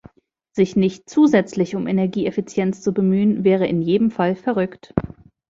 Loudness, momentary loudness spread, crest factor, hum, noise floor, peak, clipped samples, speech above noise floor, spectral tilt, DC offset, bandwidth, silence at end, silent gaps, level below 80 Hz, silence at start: -19 LUFS; 8 LU; 18 dB; none; -59 dBFS; -2 dBFS; under 0.1%; 41 dB; -7.5 dB/octave; under 0.1%; 7.8 kHz; 0.45 s; none; -50 dBFS; 0.55 s